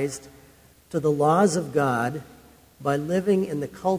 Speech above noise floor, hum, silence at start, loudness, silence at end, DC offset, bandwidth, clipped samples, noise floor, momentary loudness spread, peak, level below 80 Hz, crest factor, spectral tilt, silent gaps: 30 dB; none; 0 s; -24 LUFS; 0 s; under 0.1%; 16 kHz; under 0.1%; -54 dBFS; 12 LU; -8 dBFS; -58 dBFS; 18 dB; -6 dB/octave; none